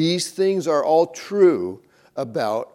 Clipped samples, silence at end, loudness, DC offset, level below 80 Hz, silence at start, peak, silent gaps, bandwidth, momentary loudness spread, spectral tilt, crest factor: under 0.1%; 0.1 s; -20 LUFS; under 0.1%; -74 dBFS; 0 s; -4 dBFS; none; 15 kHz; 13 LU; -5 dB/octave; 16 dB